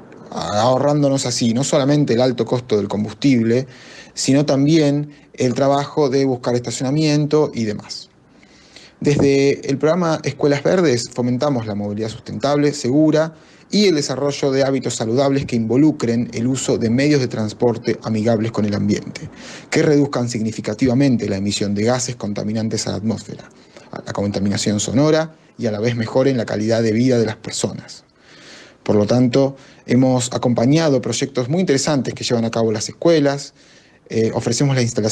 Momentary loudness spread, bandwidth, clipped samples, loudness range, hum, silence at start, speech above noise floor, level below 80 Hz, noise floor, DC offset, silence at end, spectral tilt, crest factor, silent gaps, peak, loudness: 9 LU; 12 kHz; under 0.1%; 3 LU; none; 0 s; 31 dB; -54 dBFS; -49 dBFS; under 0.1%; 0 s; -5.5 dB/octave; 14 dB; none; -4 dBFS; -18 LUFS